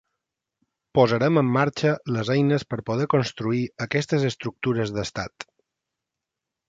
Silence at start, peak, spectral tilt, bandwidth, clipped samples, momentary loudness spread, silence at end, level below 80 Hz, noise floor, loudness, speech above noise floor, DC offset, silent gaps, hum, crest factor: 0.95 s; -4 dBFS; -6.5 dB/octave; 7.8 kHz; under 0.1%; 9 LU; 1.25 s; -56 dBFS; -86 dBFS; -24 LUFS; 63 dB; under 0.1%; none; none; 20 dB